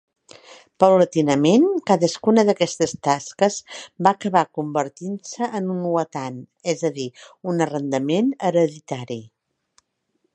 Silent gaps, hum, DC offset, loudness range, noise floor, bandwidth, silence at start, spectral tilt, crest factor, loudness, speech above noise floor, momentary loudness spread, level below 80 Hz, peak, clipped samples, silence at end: none; none; under 0.1%; 7 LU; -71 dBFS; 9.4 kHz; 0.5 s; -5.5 dB/octave; 20 dB; -21 LUFS; 51 dB; 15 LU; -66 dBFS; 0 dBFS; under 0.1%; 1.1 s